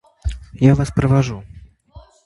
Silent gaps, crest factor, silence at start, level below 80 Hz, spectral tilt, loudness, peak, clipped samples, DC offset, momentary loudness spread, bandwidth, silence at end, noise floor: none; 18 dB; 0.25 s; -32 dBFS; -8 dB/octave; -17 LUFS; 0 dBFS; under 0.1%; under 0.1%; 14 LU; 11.5 kHz; 0.25 s; -45 dBFS